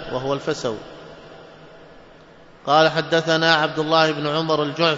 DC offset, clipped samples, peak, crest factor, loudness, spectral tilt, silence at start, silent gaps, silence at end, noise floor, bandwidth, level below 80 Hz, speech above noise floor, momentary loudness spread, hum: under 0.1%; under 0.1%; -2 dBFS; 20 dB; -19 LUFS; -4.5 dB/octave; 0 s; none; 0 s; -47 dBFS; 7.8 kHz; -56 dBFS; 27 dB; 18 LU; none